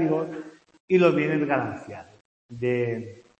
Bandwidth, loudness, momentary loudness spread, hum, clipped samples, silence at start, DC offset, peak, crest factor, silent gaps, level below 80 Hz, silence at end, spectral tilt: 8.2 kHz; -25 LUFS; 22 LU; none; under 0.1%; 0 s; under 0.1%; -6 dBFS; 20 dB; 0.80-0.88 s, 2.21-2.49 s; -68 dBFS; 0.2 s; -8 dB/octave